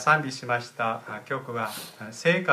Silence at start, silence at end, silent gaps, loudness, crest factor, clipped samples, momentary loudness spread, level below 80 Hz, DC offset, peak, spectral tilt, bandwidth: 0 s; 0 s; none; -28 LUFS; 20 dB; under 0.1%; 11 LU; -76 dBFS; under 0.1%; -6 dBFS; -4.5 dB/octave; 15.5 kHz